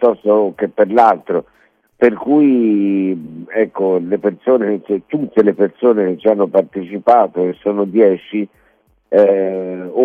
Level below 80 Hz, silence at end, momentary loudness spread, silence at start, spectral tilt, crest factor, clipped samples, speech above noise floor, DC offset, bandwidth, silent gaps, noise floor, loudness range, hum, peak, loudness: -62 dBFS; 0 s; 9 LU; 0 s; -9 dB/octave; 14 dB; under 0.1%; 42 dB; under 0.1%; 5.2 kHz; none; -56 dBFS; 2 LU; none; 0 dBFS; -15 LUFS